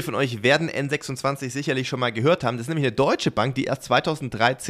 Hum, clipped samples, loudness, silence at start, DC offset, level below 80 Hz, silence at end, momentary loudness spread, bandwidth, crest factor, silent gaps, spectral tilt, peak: none; under 0.1%; -23 LUFS; 0 s; under 0.1%; -56 dBFS; 0 s; 6 LU; 15 kHz; 18 dB; none; -5 dB/octave; -6 dBFS